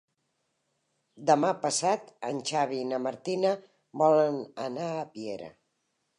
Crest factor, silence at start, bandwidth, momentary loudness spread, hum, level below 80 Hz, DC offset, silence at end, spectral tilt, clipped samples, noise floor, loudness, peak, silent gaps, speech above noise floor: 20 dB; 1.15 s; 11 kHz; 14 LU; none; -82 dBFS; under 0.1%; 0.65 s; -4 dB/octave; under 0.1%; -78 dBFS; -29 LUFS; -10 dBFS; none; 50 dB